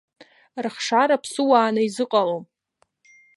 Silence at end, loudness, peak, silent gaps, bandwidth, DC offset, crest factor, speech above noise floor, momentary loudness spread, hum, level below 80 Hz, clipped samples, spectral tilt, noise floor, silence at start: 0.95 s; -21 LUFS; -4 dBFS; none; 11.5 kHz; under 0.1%; 18 dB; 48 dB; 13 LU; none; -80 dBFS; under 0.1%; -4 dB/octave; -68 dBFS; 0.55 s